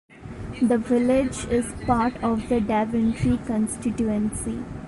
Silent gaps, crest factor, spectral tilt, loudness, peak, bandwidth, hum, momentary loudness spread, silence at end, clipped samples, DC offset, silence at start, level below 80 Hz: none; 16 dB; -6.5 dB/octave; -24 LUFS; -8 dBFS; 11.5 kHz; none; 8 LU; 0 s; under 0.1%; under 0.1%; 0.1 s; -40 dBFS